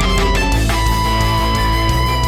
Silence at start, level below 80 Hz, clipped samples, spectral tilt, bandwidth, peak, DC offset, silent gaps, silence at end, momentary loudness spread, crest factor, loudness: 0 s; -18 dBFS; under 0.1%; -4.5 dB/octave; 16 kHz; -4 dBFS; under 0.1%; none; 0 s; 1 LU; 10 dB; -15 LUFS